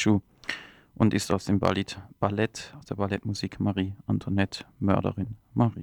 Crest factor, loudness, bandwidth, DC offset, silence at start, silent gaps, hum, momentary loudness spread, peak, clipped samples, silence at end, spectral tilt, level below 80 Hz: 22 dB; -28 LUFS; 14.5 kHz; under 0.1%; 0 s; none; none; 10 LU; -6 dBFS; under 0.1%; 0 s; -6 dB/octave; -54 dBFS